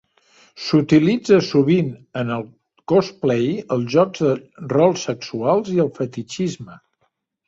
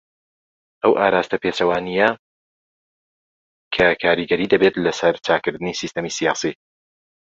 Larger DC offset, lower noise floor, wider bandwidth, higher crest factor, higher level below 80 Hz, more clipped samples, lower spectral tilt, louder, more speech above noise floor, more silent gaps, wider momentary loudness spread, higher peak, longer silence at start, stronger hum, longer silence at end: neither; second, -69 dBFS vs under -90 dBFS; about the same, 7.8 kHz vs 7.8 kHz; about the same, 18 dB vs 20 dB; about the same, -58 dBFS vs -54 dBFS; neither; first, -6.5 dB/octave vs -4 dB/octave; about the same, -19 LUFS vs -19 LUFS; second, 51 dB vs over 71 dB; second, none vs 2.19-3.71 s; first, 12 LU vs 9 LU; about the same, -2 dBFS vs -2 dBFS; second, 0.55 s vs 0.85 s; neither; about the same, 0.7 s vs 0.7 s